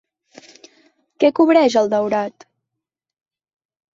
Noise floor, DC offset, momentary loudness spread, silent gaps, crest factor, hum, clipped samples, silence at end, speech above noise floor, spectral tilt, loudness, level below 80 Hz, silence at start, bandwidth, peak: -83 dBFS; under 0.1%; 9 LU; none; 18 dB; none; under 0.1%; 1.65 s; 67 dB; -5 dB/octave; -16 LUFS; -68 dBFS; 1.2 s; 7.8 kHz; -2 dBFS